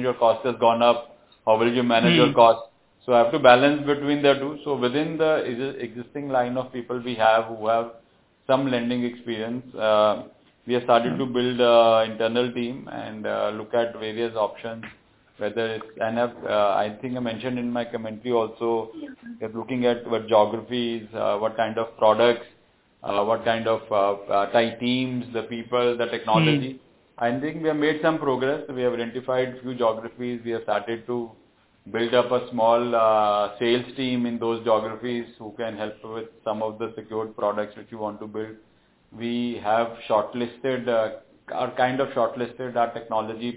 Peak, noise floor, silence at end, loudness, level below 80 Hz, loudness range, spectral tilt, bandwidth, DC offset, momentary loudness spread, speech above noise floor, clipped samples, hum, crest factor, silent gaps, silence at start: -2 dBFS; -59 dBFS; 0 s; -23 LUFS; -64 dBFS; 8 LU; -9.5 dB/octave; 4 kHz; under 0.1%; 13 LU; 36 dB; under 0.1%; none; 22 dB; none; 0 s